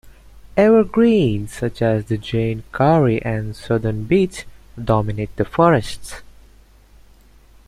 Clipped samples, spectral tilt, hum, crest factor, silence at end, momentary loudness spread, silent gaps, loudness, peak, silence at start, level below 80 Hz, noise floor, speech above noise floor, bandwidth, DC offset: under 0.1%; -7.5 dB/octave; none; 18 dB; 1.45 s; 16 LU; none; -18 LUFS; -2 dBFS; 0.05 s; -42 dBFS; -48 dBFS; 31 dB; 13.5 kHz; under 0.1%